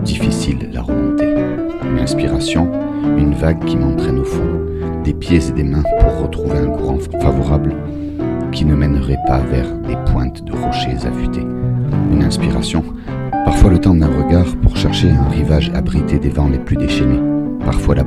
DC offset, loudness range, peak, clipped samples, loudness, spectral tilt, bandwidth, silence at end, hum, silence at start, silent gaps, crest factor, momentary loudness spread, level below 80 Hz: under 0.1%; 4 LU; 0 dBFS; 0.2%; -16 LUFS; -7 dB/octave; 12 kHz; 0 s; none; 0 s; none; 14 dB; 7 LU; -20 dBFS